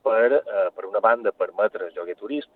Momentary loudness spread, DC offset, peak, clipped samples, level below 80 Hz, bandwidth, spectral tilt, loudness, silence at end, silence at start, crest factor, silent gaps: 12 LU; under 0.1%; -6 dBFS; under 0.1%; -80 dBFS; 4.3 kHz; -7 dB/octave; -23 LUFS; 0.1 s; 0.05 s; 18 dB; none